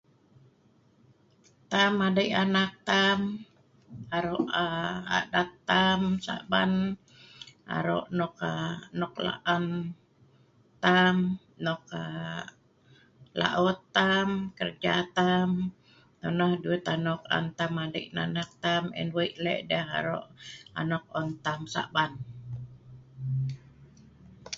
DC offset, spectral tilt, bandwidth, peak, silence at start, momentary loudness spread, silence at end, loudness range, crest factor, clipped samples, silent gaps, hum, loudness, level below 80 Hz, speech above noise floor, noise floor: under 0.1%; -5.5 dB/octave; 7.6 kHz; -8 dBFS; 1.7 s; 14 LU; 0 s; 5 LU; 22 dB; under 0.1%; none; none; -29 LUFS; -62 dBFS; 35 dB; -63 dBFS